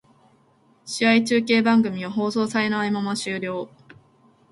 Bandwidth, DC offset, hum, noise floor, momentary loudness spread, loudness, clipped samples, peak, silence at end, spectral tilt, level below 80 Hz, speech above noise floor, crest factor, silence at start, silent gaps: 11.5 kHz; under 0.1%; none; -59 dBFS; 12 LU; -22 LUFS; under 0.1%; -4 dBFS; 0.85 s; -4.5 dB/octave; -66 dBFS; 38 dB; 18 dB; 0.85 s; none